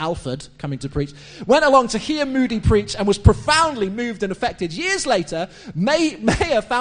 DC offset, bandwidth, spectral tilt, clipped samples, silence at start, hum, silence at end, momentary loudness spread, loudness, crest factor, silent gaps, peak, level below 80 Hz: under 0.1%; 10 kHz; -5 dB/octave; under 0.1%; 0 s; none; 0 s; 13 LU; -19 LUFS; 20 dB; none; 0 dBFS; -32 dBFS